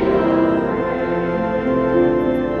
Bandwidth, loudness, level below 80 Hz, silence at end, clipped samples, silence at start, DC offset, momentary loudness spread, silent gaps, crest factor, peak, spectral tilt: 6 kHz; -18 LUFS; -40 dBFS; 0 s; under 0.1%; 0 s; under 0.1%; 4 LU; none; 12 dB; -4 dBFS; -9 dB/octave